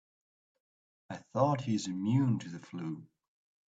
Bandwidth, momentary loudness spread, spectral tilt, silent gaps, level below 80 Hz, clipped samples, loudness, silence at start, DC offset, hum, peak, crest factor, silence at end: 8 kHz; 16 LU; -7 dB/octave; none; -74 dBFS; under 0.1%; -33 LUFS; 1.1 s; under 0.1%; none; -14 dBFS; 20 dB; 0.6 s